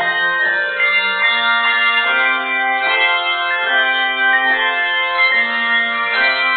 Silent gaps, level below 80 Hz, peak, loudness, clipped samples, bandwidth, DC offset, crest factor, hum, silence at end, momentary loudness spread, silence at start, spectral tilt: none; -66 dBFS; -2 dBFS; -14 LUFS; under 0.1%; 4.7 kHz; under 0.1%; 12 dB; none; 0 s; 3 LU; 0 s; -4 dB/octave